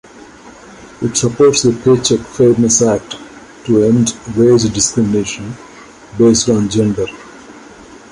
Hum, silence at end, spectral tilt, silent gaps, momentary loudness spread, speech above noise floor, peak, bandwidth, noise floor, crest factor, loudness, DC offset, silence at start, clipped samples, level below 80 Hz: none; 0.55 s; -5 dB/octave; none; 18 LU; 25 dB; 0 dBFS; 11.5 kHz; -37 dBFS; 14 dB; -13 LUFS; under 0.1%; 0.45 s; under 0.1%; -42 dBFS